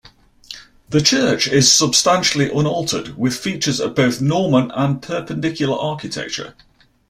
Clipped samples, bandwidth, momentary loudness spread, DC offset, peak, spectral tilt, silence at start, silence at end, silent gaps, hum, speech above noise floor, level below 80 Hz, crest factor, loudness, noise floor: under 0.1%; 16 kHz; 14 LU; under 0.1%; 0 dBFS; -3.5 dB/octave; 0.5 s; 0.6 s; none; none; 23 dB; -52 dBFS; 18 dB; -17 LUFS; -41 dBFS